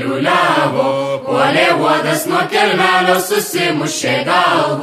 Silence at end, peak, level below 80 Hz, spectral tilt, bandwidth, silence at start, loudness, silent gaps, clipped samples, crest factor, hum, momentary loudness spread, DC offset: 0 s; 0 dBFS; -60 dBFS; -3.5 dB/octave; 15.5 kHz; 0 s; -13 LUFS; none; under 0.1%; 14 dB; none; 5 LU; under 0.1%